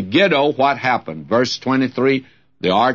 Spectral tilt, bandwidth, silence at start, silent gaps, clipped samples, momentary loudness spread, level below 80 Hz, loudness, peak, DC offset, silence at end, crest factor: -5.5 dB/octave; 7.4 kHz; 0 s; none; under 0.1%; 7 LU; -60 dBFS; -17 LUFS; -2 dBFS; 0.2%; 0 s; 14 dB